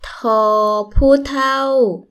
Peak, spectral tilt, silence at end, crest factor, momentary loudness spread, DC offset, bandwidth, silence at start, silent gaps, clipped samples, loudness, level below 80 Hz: 0 dBFS; -6 dB/octave; 0.1 s; 14 dB; 4 LU; under 0.1%; 13.5 kHz; 0 s; none; under 0.1%; -15 LUFS; -26 dBFS